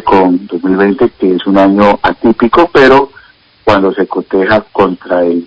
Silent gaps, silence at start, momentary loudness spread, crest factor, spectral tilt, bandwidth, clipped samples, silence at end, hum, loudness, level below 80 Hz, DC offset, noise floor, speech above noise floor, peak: none; 0.05 s; 7 LU; 10 dB; -7.5 dB/octave; 8 kHz; 2%; 0 s; none; -9 LUFS; -38 dBFS; under 0.1%; -41 dBFS; 32 dB; 0 dBFS